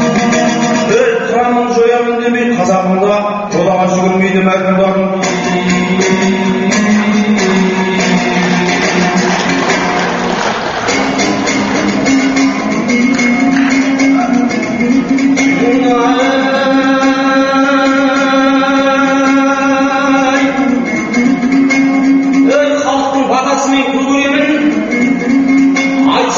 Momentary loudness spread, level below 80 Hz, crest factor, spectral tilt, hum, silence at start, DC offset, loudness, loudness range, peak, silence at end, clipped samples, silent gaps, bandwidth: 3 LU; -44 dBFS; 10 dB; -4 dB/octave; none; 0 s; under 0.1%; -11 LUFS; 2 LU; 0 dBFS; 0 s; under 0.1%; none; 7.6 kHz